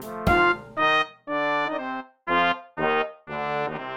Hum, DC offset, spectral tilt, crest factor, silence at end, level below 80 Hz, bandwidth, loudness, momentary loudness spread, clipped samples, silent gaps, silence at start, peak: none; under 0.1%; -5.5 dB/octave; 18 dB; 0 s; -44 dBFS; 17 kHz; -24 LUFS; 10 LU; under 0.1%; none; 0 s; -6 dBFS